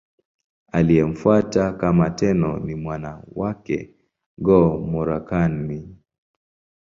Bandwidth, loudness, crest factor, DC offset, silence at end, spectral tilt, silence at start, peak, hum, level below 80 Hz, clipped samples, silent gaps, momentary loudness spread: 7.4 kHz; -21 LUFS; 18 dB; under 0.1%; 0.95 s; -8.5 dB/octave; 0.75 s; -2 dBFS; none; -42 dBFS; under 0.1%; 4.26-4.37 s; 12 LU